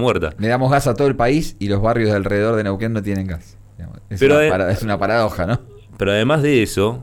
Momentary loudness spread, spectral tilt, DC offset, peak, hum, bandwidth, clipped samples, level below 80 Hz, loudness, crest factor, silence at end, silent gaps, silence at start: 10 LU; -6.5 dB/octave; under 0.1%; -6 dBFS; none; 17.5 kHz; under 0.1%; -36 dBFS; -17 LUFS; 12 dB; 0 s; none; 0 s